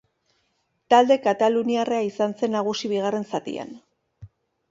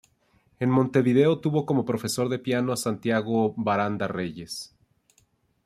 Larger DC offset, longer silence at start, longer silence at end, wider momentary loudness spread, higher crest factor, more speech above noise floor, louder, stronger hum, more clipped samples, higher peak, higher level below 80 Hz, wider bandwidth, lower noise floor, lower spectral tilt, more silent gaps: neither; first, 0.9 s vs 0.6 s; second, 0.45 s vs 1 s; about the same, 12 LU vs 12 LU; about the same, 20 dB vs 18 dB; first, 50 dB vs 42 dB; first, -22 LUFS vs -25 LUFS; neither; neither; first, -4 dBFS vs -8 dBFS; about the same, -66 dBFS vs -64 dBFS; second, 7.8 kHz vs 15.5 kHz; first, -71 dBFS vs -66 dBFS; about the same, -5 dB/octave vs -6 dB/octave; neither